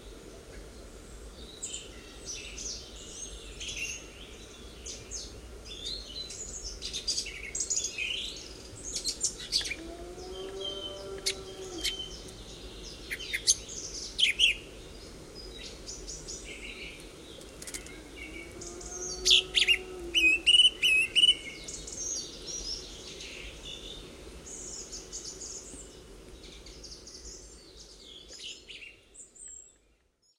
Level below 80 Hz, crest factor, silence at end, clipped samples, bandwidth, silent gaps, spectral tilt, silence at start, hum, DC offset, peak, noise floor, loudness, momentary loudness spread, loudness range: -52 dBFS; 24 dB; 0.65 s; under 0.1%; 16 kHz; none; 0 dB/octave; 0 s; none; under 0.1%; -10 dBFS; -69 dBFS; -29 LUFS; 24 LU; 19 LU